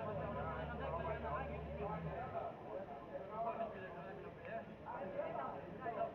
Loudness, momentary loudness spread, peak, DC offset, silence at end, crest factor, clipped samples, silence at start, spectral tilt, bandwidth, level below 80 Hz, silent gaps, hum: -46 LUFS; 7 LU; -30 dBFS; under 0.1%; 0 s; 14 dB; under 0.1%; 0 s; -6 dB/octave; 6.6 kHz; -60 dBFS; none; none